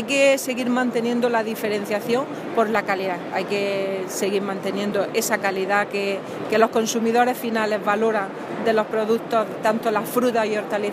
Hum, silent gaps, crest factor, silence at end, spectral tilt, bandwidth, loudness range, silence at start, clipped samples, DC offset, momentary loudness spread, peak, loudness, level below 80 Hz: none; none; 20 dB; 0 s; -4 dB/octave; 15.5 kHz; 2 LU; 0 s; under 0.1%; under 0.1%; 6 LU; -2 dBFS; -22 LUFS; -70 dBFS